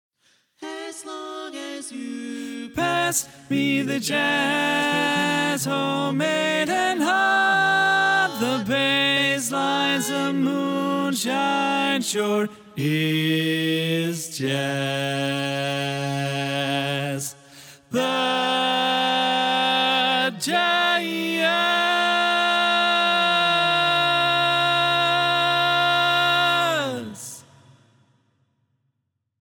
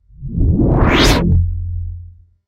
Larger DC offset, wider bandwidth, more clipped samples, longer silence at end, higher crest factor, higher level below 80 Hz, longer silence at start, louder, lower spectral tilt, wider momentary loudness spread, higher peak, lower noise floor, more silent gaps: neither; first, over 20 kHz vs 15 kHz; neither; first, 2 s vs 0.35 s; about the same, 14 dB vs 14 dB; second, -68 dBFS vs -20 dBFS; first, 0.6 s vs 0.2 s; second, -21 LUFS vs -14 LUFS; second, -3.5 dB/octave vs -5.5 dB/octave; second, 12 LU vs 16 LU; second, -8 dBFS vs 0 dBFS; first, -76 dBFS vs -37 dBFS; neither